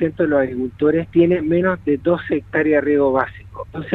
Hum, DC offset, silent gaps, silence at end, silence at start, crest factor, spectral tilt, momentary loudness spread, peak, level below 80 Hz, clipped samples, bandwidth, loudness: none; under 0.1%; none; 0 s; 0 s; 16 dB; -10 dB/octave; 9 LU; -2 dBFS; -46 dBFS; under 0.1%; 4.1 kHz; -18 LUFS